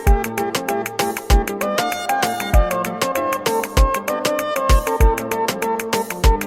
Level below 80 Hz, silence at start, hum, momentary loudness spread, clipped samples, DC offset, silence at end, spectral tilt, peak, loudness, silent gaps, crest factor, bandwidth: -22 dBFS; 0 s; none; 4 LU; under 0.1%; under 0.1%; 0 s; -4.5 dB/octave; -2 dBFS; -20 LUFS; none; 16 dB; 16.5 kHz